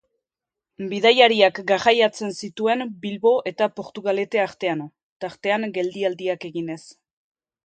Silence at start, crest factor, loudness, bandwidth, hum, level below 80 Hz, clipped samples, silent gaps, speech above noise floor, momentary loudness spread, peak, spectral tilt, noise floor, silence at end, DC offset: 0.8 s; 22 dB; -21 LUFS; 9 kHz; none; -70 dBFS; under 0.1%; 5.03-5.20 s; 66 dB; 15 LU; 0 dBFS; -4 dB/octave; -88 dBFS; 0.75 s; under 0.1%